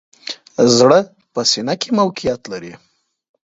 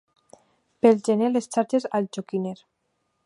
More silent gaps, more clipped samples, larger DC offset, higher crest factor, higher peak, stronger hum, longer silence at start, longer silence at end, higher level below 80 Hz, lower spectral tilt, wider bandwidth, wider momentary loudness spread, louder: neither; neither; neither; about the same, 18 dB vs 22 dB; first, 0 dBFS vs -4 dBFS; neither; second, 0.25 s vs 0.85 s; about the same, 0.65 s vs 0.7 s; first, -54 dBFS vs -76 dBFS; second, -4 dB/octave vs -6 dB/octave; second, 7.8 kHz vs 11.5 kHz; first, 18 LU vs 10 LU; first, -15 LUFS vs -24 LUFS